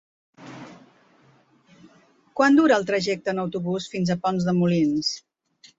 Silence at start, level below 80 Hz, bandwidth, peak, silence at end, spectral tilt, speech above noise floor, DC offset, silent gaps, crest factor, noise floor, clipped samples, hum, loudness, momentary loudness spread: 0.4 s; -64 dBFS; 8 kHz; -6 dBFS; 0.6 s; -6 dB/octave; 37 dB; under 0.1%; none; 18 dB; -58 dBFS; under 0.1%; none; -22 LUFS; 21 LU